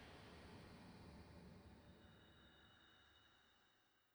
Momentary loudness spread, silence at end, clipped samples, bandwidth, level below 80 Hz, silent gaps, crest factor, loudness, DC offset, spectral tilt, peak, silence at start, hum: 7 LU; 0 s; under 0.1%; over 20 kHz; -74 dBFS; none; 14 dB; -64 LUFS; under 0.1%; -5.5 dB/octave; -50 dBFS; 0 s; none